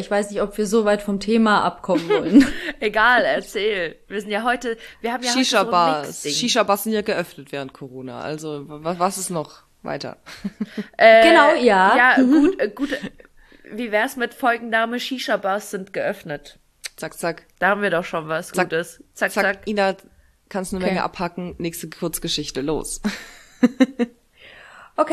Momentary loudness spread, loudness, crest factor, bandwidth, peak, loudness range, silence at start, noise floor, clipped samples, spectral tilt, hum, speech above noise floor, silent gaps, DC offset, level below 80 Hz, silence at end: 17 LU; -20 LUFS; 20 dB; 14 kHz; -2 dBFS; 10 LU; 0 s; -46 dBFS; under 0.1%; -4 dB/octave; none; 26 dB; none; under 0.1%; -48 dBFS; 0 s